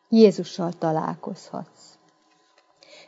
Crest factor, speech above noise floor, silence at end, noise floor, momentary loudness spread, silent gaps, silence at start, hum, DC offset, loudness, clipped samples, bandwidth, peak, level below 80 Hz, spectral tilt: 22 dB; 40 dB; 1.45 s; -62 dBFS; 21 LU; none; 0.1 s; none; under 0.1%; -23 LUFS; under 0.1%; 8 kHz; -2 dBFS; -76 dBFS; -7 dB/octave